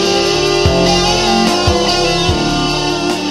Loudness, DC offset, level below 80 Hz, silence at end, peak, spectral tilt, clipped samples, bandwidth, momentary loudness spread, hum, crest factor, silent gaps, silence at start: -12 LUFS; under 0.1%; -26 dBFS; 0 s; 0 dBFS; -4 dB/octave; under 0.1%; 15 kHz; 4 LU; none; 12 dB; none; 0 s